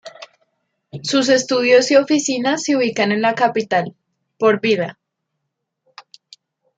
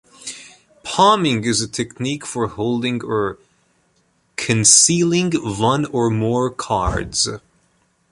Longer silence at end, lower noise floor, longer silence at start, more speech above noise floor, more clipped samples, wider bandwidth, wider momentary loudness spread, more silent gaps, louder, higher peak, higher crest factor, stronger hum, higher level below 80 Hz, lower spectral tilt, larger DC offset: first, 1.85 s vs 0.75 s; first, -77 dBFS vs -62 dBFS; second, 0.05 s vs 0.2 s; first, 61 dB vs 44 dB; neither; second, 9.2 kHz vs 13 kHz; second, 14 LU vs 18 LU; neither; about the same, -17 LUFS vs -17 LUFS; about the same, -2 dBFS vs 0 dBFS; about the same, 18 dB vs 20 dB; neither; second, -70 dBFS vs -40 dBFS; about the same, -3.5 dB/octave vs -3.5 dB/octave; neither